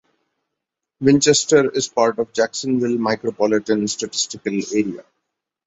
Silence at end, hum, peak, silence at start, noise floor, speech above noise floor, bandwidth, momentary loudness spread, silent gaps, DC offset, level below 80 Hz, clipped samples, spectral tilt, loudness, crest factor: 0.65 s; none; -2 dBFS; 1 s; -81 dBFS; 63 dB; 8.4 kHz; 8 LU; none; under 0.1%; -60 dBFS; under 0.1%; -4 dB/octave; -19 LUFS; 18 dB